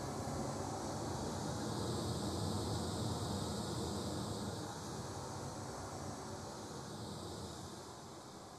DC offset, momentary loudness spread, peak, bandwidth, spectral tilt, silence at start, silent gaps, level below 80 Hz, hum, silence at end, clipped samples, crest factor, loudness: under 0.1%; 7 LU; -28 dBFS; 14.5 kHz; -5 dB/octave; 0 s; none; -58 dBFS; none; 0 s; under 0.1%; 16 dB; -43 LUFS